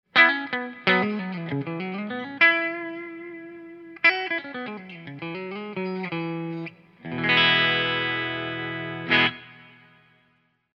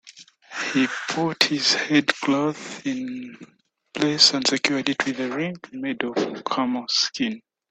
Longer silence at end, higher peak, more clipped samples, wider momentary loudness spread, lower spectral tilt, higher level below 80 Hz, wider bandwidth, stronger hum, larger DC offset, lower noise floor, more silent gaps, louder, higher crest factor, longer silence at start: first, 1.05 s vs 0.35 s; about the same, -2 dBFS vs 0 dBFS; neither; first, 20 LU vs 14 LU; first, -6 dB/octave vs -3 dB/octave; about the same, -70 dBFS vs -68 dBFS; second, 7.2 kHz vs 13 kHz; neither; neither; first, -67 dBFS vs -48 dBFS; neither; about the same, -23 LUFS vs -22 LUFS; about the same, 24 dB vs 24 dB; about the same, 0.15 s vs 0.05 s